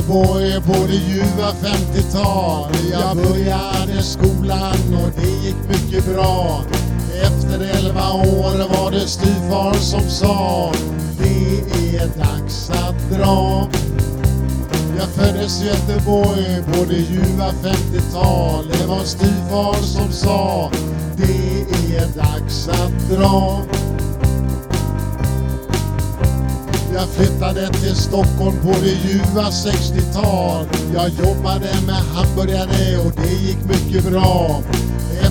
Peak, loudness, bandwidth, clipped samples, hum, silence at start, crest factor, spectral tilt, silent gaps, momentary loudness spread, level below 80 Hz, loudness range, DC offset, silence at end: 0 dBFS; -17 LUFS; 19.5 kHz; under 0.1%; none; 0 s; 16 dB; -6 dB/octave; none; 5 LU; -24 dBFS; 2 LU; under 0.1%; 0 s